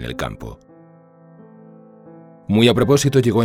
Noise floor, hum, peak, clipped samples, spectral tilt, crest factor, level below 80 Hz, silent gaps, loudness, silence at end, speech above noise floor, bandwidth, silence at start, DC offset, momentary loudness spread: -47 dBFS; none; -2 dBFS; under 0.1%; -5.5 dB/octave; 18 dB; -44 dBFS; none; -17 LUFS; 0 s; 31 dB; 16 kHz; 0 s; under 0.1%; 22 LU